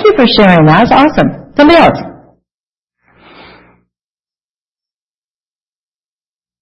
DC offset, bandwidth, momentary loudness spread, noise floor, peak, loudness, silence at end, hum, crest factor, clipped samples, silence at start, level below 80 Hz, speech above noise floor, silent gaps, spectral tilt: under 0.1%; 8.6 kHz; 9 LU; under -90 dBFS; 0 dBFS; -7 LUFS; 4.5 s; none; 12 dB; 0.4%; 0 s; -36 dBFS; over 84 dB; none; -7.5 dB/octave